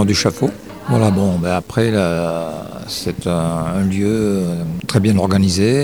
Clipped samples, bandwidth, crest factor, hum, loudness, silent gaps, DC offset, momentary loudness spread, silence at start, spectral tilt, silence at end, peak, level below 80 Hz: under 0.1%; over 20 kHz; 16 dB; none; -17 LUFS; none; 0.3%; 9 LU; 0 s; -6 dB/octave; 0 s; 0 dBFS; -42 dBFS